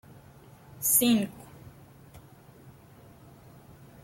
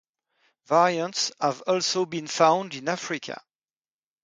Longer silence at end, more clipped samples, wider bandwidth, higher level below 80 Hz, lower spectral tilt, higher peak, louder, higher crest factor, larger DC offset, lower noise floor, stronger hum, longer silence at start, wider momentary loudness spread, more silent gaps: first, 1.35 s vs 0.9 s; neither; first, 16.5 kHz vs 9.6 kHz; first, -64 dBFS vs -76 dBFS; about the same, -3 dB/octave vs -3 dB/octave; about the same, -8 dBFS vs -6 dBFS; about the same, -24 LUFS vs -25 LUFS; about the same, 24 dB vs 20 dB; neither; second, -53 dBFS vs under -90 dBFS; neither; about the same, 0.8 s vs 0.7 s; first, 28 LU vs 11 LU; neither